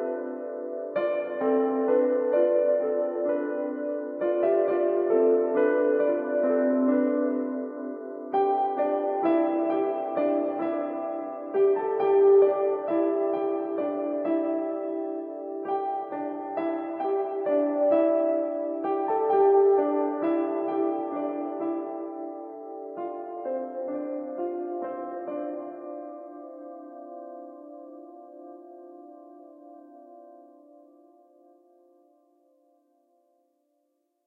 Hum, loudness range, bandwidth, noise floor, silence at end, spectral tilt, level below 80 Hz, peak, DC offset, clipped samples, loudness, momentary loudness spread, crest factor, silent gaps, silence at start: none; 14 LU; 3.8 kHz; -75 dBFS; 3.85 s; -9.5 dB/octave; under -90 dBFS; -10 dBFS; under 0.1%; under 0.1%; -26 LUFS; 18 LU; 16 dB; none; 0 s